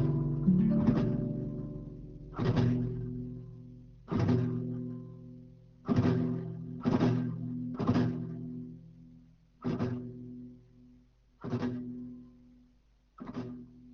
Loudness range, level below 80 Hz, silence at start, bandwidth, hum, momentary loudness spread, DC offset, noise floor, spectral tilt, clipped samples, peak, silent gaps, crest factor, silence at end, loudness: 10 LU; -52 dBFS; 0 s; 6.6 kHz; none; 20 LU; under 0.1%; -66 dBFS; -9 dB/octave; under 0.1%; -14 dBFS; none; 18 dB; 0 s; -33 LUFS